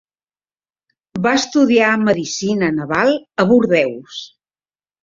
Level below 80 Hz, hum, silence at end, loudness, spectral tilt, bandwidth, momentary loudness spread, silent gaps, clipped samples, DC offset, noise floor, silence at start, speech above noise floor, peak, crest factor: -56 dBFS; none; 0.75 s; -15 LUFS; -5 dB/octave; 7.6 kHz; 15 LU; none; under 0.1%; under 0.1%; under -90 dBFS; 1.15 s; over 75 dB; -2 dBFS; 16 dB